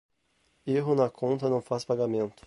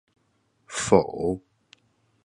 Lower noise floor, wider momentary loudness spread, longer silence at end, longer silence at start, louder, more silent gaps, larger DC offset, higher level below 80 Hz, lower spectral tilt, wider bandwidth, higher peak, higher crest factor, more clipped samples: about the same, -71 dBFS vs -69 dBFS; second, 4 LU vs 14 LU; second, 0.15 s vs 0.85 s; about the same, 0.65 s vs 0.7 s; second, -28 LUFS vs -25 LUFS; neither; neither; second, -68 dBFS vs -54 dBFS; first, -7.5 dB/octave vs -5 dB/octave; about the same, 11.5 kHz vs 11.5 kHz; second, -12 dBFS vs -4 dBFS; second, 18 dB vs 24 dB; neither